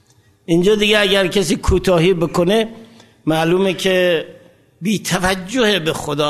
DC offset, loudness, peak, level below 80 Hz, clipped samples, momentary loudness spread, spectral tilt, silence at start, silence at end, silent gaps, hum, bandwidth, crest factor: under 0.1%; -16 LUFS; 0 dBFS; -34 dBFS; under 0.1%; 8 LU; -4.5 dB/octave; 0.5 s; 0 s; none; none; 13.5 kHz; 16 dB